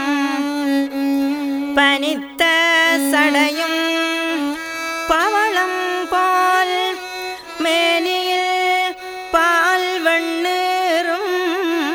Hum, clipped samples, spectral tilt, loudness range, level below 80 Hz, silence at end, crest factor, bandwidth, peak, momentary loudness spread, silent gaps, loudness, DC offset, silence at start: none; under 0.1%; -1 dB/octave; 2 LU; -54 dBFS; 0 s; 16 dB; over 20 kHz; -2 dBFS; 8 LU; none; -17 LUFS; under 0.1%; 0 s